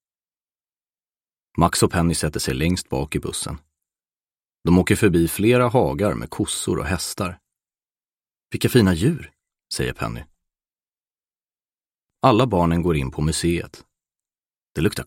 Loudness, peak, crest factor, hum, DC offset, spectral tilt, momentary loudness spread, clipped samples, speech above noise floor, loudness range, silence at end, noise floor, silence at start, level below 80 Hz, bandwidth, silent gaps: -21 LUFS; -2 dBFS; 20 dB; none; under 0.1%; -5.5 dB/octave; 13 LU; under 0.1%; over 70 dB; 4 LU; 0 s; under -90 dBFS; 1.55 s; -40 dBFS; 16.5 kHz; 11.74-11.78 s